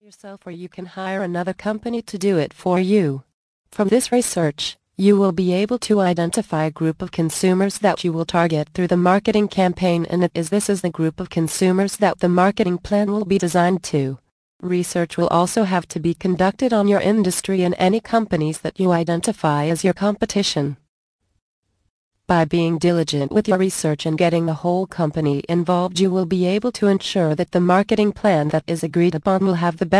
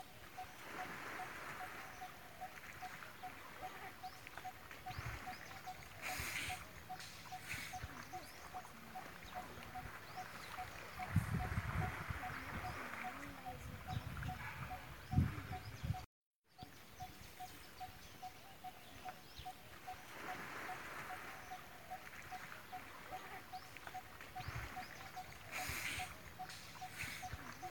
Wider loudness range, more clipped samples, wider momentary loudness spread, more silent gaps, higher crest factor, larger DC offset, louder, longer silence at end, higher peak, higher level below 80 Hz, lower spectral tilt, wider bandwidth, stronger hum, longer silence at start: second, 3 LU vs 7 LU; neither; second, 7 LU vs 11 LU; first, 3.34-3.65 s, 14.31-14.59 s, 20.89-21.19 s, 21.42-21.63 s, 21.90-22.11 s vs 16.06-16.42 s; second, 16 dB vs 26 dB; neither; first, -19 LUFS vs -48 LUFS; about the same, 0 s vs 0 s; first, -2 dBFS vs -22 dBFS; first, -52 dBFS vs -60 dBFS; about the same, -5.5 dB/octave vs -4.5 dB/octave; second, 11 kHz vs 18 kHz; neither; first, 0.25 s vs 0 s